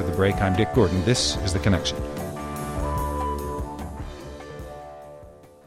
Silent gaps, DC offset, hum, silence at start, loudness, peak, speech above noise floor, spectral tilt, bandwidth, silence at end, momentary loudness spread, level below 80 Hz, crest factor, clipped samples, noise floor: none; under 0.1%; none; 0 s; -24 LUFS; -6 dBFS; 25 dB; -5 dB/octave; 16 kHz; 0.2 s; 18 LU; -36 dBFS; 18 dB; under 0.1%; -46 dBFS